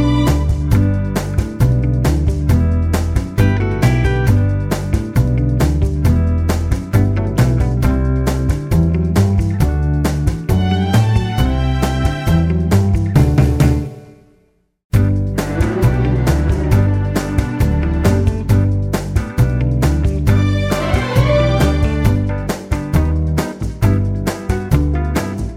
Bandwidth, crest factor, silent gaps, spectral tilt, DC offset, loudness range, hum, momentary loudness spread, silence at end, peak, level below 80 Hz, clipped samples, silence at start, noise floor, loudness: 16.5 kHz; 14 dB; 14.84-14.90 s; -7 dB/octave; under 0.1%; 1 LU; none; 5 LU; 0 s; 0 dBFS; -20 dBFS; under 0.1%; 0 s; -57 dBFS; -16 LUFS